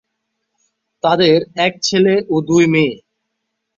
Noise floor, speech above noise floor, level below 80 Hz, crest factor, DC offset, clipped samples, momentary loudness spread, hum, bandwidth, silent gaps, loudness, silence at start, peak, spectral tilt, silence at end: -74 dBFS; 61 dB; -58 dBFS; 16 dB; under 0.1%; under 0.1%; 7 LU; none; 7.6 kHz; none; -14 LUFS; 1.05 s; -2 dBFS; -5 dB/octave; 0.8 s